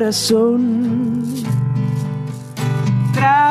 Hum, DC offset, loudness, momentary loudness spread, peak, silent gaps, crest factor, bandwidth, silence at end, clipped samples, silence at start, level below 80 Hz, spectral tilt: none; under 0.1%; -17 LUFS; 9 LU; -2 dBFS; none; 14 dB; 14.5 kHz; 0 s; under 0.1%; 0 s; -54 dBFS; -6 dB/octave